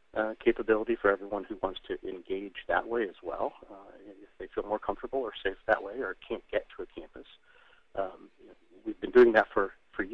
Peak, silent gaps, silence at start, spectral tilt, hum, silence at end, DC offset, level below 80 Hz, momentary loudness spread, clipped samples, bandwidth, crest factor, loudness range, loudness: -8 dBFS; none; 0.15 s; -7 dB/octave; none; 0 s; under 0.1%; -54 dBFS; 18 LU; under 0.1%; 5.6 kHz; 22 dB; 7 LU; -30 LUFS